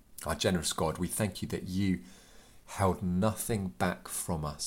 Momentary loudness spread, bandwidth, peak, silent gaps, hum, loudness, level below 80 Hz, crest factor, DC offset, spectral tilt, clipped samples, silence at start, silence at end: 6 LU; 17 kHz; -12 dBFS; none; none; -32 LUFS; -52 dBFS; 20 dB; under 0.1%; -4.5 dB/octave; under 0.1%; 0.1 s; 0 s